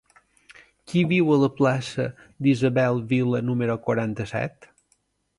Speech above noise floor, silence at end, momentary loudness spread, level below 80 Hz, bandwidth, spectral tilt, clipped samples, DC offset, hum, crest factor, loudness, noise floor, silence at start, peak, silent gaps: 46 dB; 0.9 s; 10 LU; -60 dBFS; 11.5 kHz; -7.5 dB/octave; under 0.1%; under 0.1%; none; 16 dB; -23 LUFS; -69 dBFS; 0.9 s; -8 dBFS; none